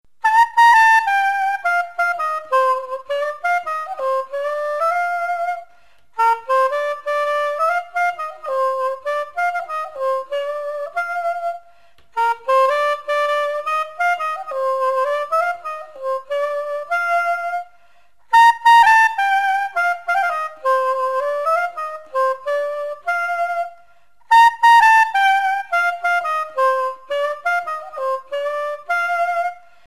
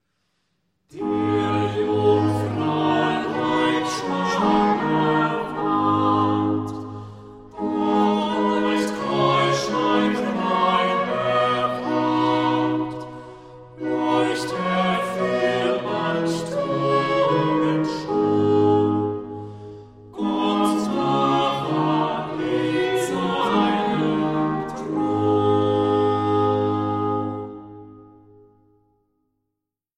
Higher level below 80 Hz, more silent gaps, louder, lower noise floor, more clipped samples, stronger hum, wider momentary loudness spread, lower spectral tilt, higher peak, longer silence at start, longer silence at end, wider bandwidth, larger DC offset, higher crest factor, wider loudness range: second, -64 dBFS vs -56 dBFS; neither; first, -18 LUFS vs -21 LUFS; second, -58 dBFS vs -82 dBFS; neither; neither; first, 13 LU vs 10 LU; second, 0.5 dB/octave vs -6 dB/octave; about the same, -4 dBFS vs -6 dBFS; second, 0.25 s vs 0.95 s; second, 0.35 s vs 1.9 s; about the same, 13.5 kHz vs 12.5 kHz; first, 0.5% vs under 0.1%; about the same, 14 dB vs 14 dB; first, 7 LU vs 3 LU